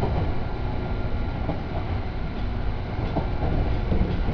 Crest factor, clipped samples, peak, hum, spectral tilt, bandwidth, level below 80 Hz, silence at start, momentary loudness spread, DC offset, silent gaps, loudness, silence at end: 14 dB; under 0.1%; -10 dBFS; none; -9 dB/octave; 5.4 kHz; -28 dBFS; 0 s; 5 LU; under 0.1%; none; -28 LUFS; 0 s